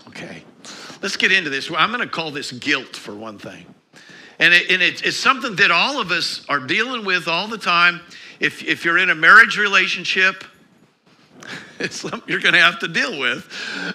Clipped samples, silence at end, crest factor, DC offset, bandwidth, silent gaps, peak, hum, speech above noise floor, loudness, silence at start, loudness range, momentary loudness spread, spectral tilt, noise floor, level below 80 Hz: under 0.1%; 0 s; 20 dB; under 0.1%; 15.5 kHz; none; 0 dBFS; none; 36 dB; -16 LUFS; 0.05 s; 6 LU; 21 LU; -2.5 dB/octave; -54 dBFS; -68 dBFS